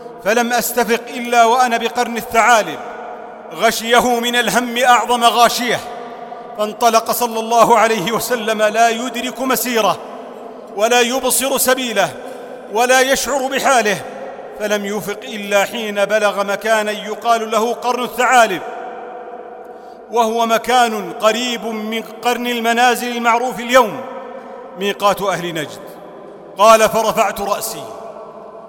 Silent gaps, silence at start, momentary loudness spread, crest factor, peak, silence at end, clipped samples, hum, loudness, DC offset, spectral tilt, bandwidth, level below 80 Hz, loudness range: none; 0 s; 19 LU; 16 dB; 0 dBFS; 0 s; under 0.1%; none; -15 LUFS; under 0.1%; -2.5 dB/octave; 17 kHz; -54 dBFS; 3 LU